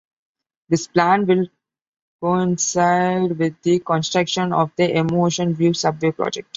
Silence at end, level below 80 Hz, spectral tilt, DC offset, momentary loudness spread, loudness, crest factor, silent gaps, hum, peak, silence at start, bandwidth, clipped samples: 0.15 s; -60 dBFS; -5 dB/octave; under 0.1%; 5 LU; -19 LUFS; 18 dB; 1.88-1.93 s, 2.02-2.19 s; none; -2 dBFS; 0.7 s; 7.8 kHz; under 0.1%